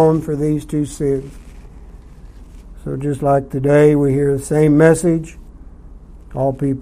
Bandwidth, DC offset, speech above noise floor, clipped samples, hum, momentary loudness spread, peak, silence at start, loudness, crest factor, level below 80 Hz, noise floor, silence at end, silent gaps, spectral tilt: 15 kHz; under 0.1%; 23 dB; under 0.1%; none; 14 LU; 0 dBFS; 0 s; -16 LUFS; 16 dB; -38 dBFS; -38 dBFS; 0 s; none; -7.5 dB/octave